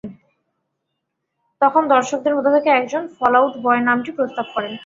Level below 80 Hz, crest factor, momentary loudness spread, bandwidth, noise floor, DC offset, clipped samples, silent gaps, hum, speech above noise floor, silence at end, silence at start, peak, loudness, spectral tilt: -64 dBFS; 18 dB; 9 LU; 7.8 kHz; -76 dBFS; under 0.1%; under 0.1%; none; none; 59 dB; 0 s; 0.05 s; -2 dBFS; -17 LUFS; -4.5 dB/octave